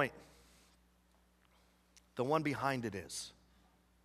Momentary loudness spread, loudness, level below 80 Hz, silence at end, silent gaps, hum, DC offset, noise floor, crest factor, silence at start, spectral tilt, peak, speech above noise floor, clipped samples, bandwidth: 16 LU; -38 LUFS; -70 dBFS; 0.75 s; none; none; under 0.1%; -71 dBFS; 24 dB; 0 s; -5 dB/octave; -18 dBFS; 33 dB; under 0.1%; 15 kHz